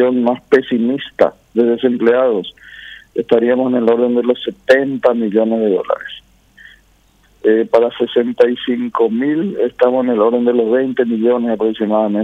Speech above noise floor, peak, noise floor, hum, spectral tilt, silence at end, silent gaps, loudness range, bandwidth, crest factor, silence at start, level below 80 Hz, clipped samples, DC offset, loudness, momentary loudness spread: 38 dB; 0 dBFS; -53 dBFS; none; -7 dB/octave; 0 s; none; 3 LU; 6.8 kHz; 14 dB; 0 s; -58 dBFS; under 0.1%; under 0.1%; -15 LUFS; 7 LU